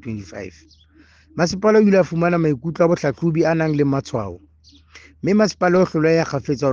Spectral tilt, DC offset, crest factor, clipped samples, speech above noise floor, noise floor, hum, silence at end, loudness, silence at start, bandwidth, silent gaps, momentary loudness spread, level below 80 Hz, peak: -7 dB/octave; under 0.1%; 16 dB; under 0.1%; 33 dB; -51 dBFS; none; 0 s; -18 LUFS; 0.05 s; 7.4 kHz; none; 16 LU; -52 dBFS; -4 dBFS